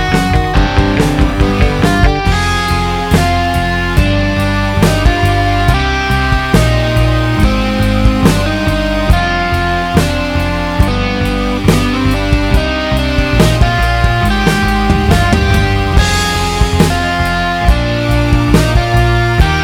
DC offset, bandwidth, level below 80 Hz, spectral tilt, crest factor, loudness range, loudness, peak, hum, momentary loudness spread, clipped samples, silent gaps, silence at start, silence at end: under 0.1%; 16.5 kHz; -16 dBFS; -5.5 dB/octave; 10 dB; 2 LU; -12 LUFS; 0 dBFS; none; 3 LU; 0.3%; none; 0 s; 0 s